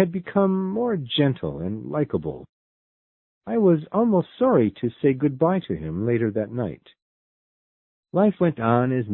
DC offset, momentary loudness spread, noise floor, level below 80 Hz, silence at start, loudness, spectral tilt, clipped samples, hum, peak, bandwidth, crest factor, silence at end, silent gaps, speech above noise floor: under 0.1%; 9 LU; under -90 dBFS; -54 dBFS; 0 s; -23 LUFS; -12 dB/octave; under 0.1%; none; -4 dBFS; 4.2 kHz; 20 dB; 0 s; 2.49-3.41 s, 7.02-8.03 s; over 68 dB